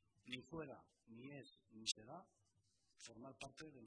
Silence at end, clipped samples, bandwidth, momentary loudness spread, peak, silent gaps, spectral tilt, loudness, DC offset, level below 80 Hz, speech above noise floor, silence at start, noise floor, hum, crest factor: 0 s; under 0.1%; 11 kHz; 16 LU; -28 dBFS; none; -2.5 dB/octave; -52 LUFS; under 0.1%; -82 dBFS; 27 dB; 0.15 s; -82 dBFS; none; 28 dB